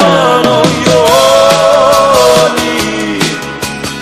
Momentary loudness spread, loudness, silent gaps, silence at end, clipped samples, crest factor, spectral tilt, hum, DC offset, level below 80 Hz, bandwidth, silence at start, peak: 9 LU; -8 LUFS; none; 0 s; 1%; 8 dB; -3.5 dB/octave; none; under 0.1%; -38 dBFS; 16 kHz; 0 s; 0 dBFS